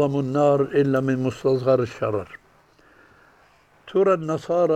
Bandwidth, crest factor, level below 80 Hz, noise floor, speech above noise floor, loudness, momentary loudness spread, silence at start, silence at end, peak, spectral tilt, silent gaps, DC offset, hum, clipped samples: 9.2 kHz; 16 dB; -60 dBFS; -56 dBFS; 36 dB; -22 LUFS; 7 LU; 0 s; 0 s; -6 dBFS; -8 dB/octave; none; under 0.1%; none; under 0.1%